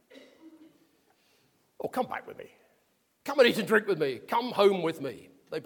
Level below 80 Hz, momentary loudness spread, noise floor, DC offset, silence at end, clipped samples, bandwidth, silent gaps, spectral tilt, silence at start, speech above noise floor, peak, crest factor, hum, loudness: -78 dBFS; 18 LU; -71 dBFS; under 0.1%; 0.05 s; under 0.1%; 19 kHz; none; -4.5 dB/octave; 0.15 s; 44 dB; -8 dBFS; 22 dB; none; -28 LUFS